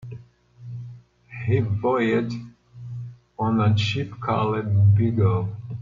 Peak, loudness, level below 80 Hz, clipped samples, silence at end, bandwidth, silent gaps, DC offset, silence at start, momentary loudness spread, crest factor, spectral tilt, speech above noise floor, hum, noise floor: -8 dBFS; -22 LUFS; -54 dBFS; under 0.1%; 0 s; 7.2 kHz; none; under 0.1%; 0 s; 20 LU; 14 dB; -8 dB/octave; 26 dB; 60 Hz at -40 dBFS; -47 dBFS